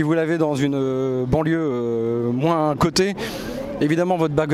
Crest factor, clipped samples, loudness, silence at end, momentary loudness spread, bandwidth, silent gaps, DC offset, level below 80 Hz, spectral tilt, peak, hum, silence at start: 14 dB; under 0.1%; -21 LUFS; 0 s; 5 LU; 15 kHz; none; under 0.1%; -44 dBFS; -6 dB/octave; -6 dBFS; none; 0 s